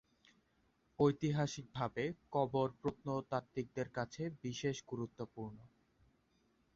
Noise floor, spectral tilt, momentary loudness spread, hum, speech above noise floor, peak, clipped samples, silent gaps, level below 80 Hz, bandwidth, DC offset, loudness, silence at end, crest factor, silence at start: -77 dBFS; -6 dB/octave; 11 LU; none; 37 dB; -20 dBFS; under 0.1%; none; -70 dBFS; 7.6 kHz; under 0.1%; -40 LUFS; 1.1 s; 22 dB; 1 s